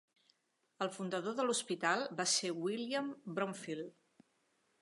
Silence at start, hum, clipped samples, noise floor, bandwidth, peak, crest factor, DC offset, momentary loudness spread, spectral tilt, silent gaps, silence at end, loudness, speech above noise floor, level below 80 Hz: 0.8 s; none; under 0.1%; -80 dBFS; 11.5 kHz; -20 dBFS; 20 dB; under 0.1%; 10 LU; -2.5 dB/octave; none; 0.9 s; -37 LUFS; 42 dB; under -90 dBFS